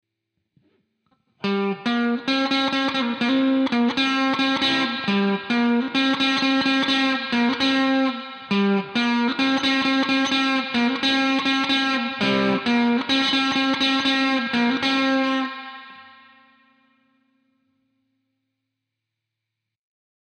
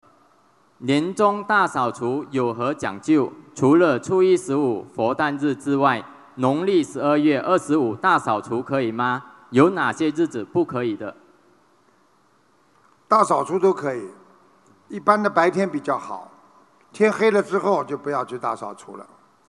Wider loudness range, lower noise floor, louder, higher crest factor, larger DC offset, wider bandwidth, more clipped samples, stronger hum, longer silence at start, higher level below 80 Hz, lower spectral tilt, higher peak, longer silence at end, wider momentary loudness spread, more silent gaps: about the same, 4 LU vs 4 LU; first, -83 dBFS vs -60 dBFS; about the same, -20 LUFS vs -21 LUFS; second, 12 dB vs 22 dB; neither; second, 9 kHz vs 11.5 kHz; neither; neither; first, 1.45 s vs 0.8 s; about the same, -64 dBFS vs -68 dBFS; second, -4 dB/octave vs -6 dB/octave; second, -10 dBFS vs 0 dBFS; first, 4.25 s vs 0.45 s; second, 4 LU vs 11 LU; neither